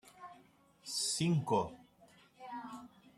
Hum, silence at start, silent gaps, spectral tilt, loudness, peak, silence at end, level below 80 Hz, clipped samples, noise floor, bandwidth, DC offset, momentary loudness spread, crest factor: none; 0.05 s; none; -4.5 dB/octave; -36 LUFS; -20 dBFS; 0.3 s; -72 dBFS; under 0.1%; -65 dBFS; 13.5 kHz; under 0.1%; 22 LU; 20 dB